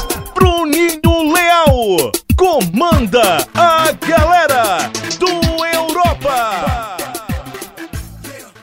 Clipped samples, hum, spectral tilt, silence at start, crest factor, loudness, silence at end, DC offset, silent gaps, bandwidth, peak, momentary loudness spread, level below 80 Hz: under 0.1%; none; -4.5 dB/octave; 0 s; 14 dB; -13 LUFS; 0.15 s; under 0.1%; none; 16.5 kHz; 0 dBFS; 16 LU; -26 dBFS